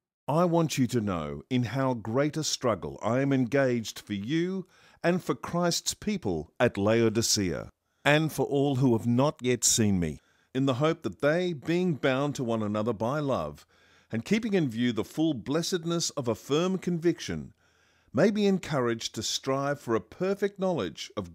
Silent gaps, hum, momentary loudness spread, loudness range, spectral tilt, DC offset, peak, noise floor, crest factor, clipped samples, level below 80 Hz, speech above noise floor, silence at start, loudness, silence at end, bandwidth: none; none; 8 LU; 4 LU; -5 dB/octave; under 0.1%; -8 dBFS; -66 dBFS; 20 dB; under 0.1%; -58 dBFS; 38 dB; 0.3 s; -28 LUFS; 0 s; 16 kHz